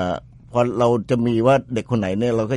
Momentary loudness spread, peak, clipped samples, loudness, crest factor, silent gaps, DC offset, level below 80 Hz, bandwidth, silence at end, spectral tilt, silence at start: 8 LU; -4 dBFS; under 0.1%; -20 LUFS; 16 dB; none; under 0.1%; -50 dBFS; 11.5 kHz; 0 s; -7.5 dB/octave; 0 s